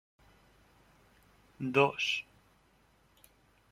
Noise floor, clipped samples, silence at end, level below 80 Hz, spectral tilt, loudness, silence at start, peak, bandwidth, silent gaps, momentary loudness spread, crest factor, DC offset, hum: -67 dBFS; under 0.1%; 1.5 s; -72 dBFS; -4.5 dB/octave; -31 LUFS; 1.6 s; -10 dBFS; 14.5 kHz; none; 15 LU; 26 dB; under 0.1%; none